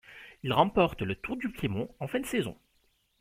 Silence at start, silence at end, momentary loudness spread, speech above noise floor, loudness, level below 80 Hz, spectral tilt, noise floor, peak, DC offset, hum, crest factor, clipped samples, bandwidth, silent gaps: 0.1 s; 0.7 s; 12 LU; 41 dB; -30 LUFS; -54 dBFS; -6 dB/octave; -71 dBFS; -10 dBFS; under 0.1%; none; 22 dB; under 0.1%; 16.5 kHz; none